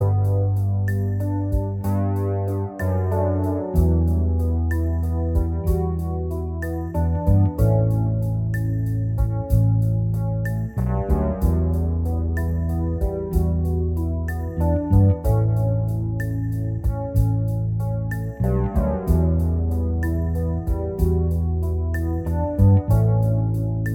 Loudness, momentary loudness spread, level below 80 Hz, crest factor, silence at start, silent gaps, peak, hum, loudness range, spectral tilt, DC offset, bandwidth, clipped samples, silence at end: -22 LUFS; 6 LU; -28 dBFS; 14 dB; 0 s; none; -6 dBFS; none; 2 LU; -10 dB/octave; under 0.1%; 15.5 kHz; under 0.1%; 0 s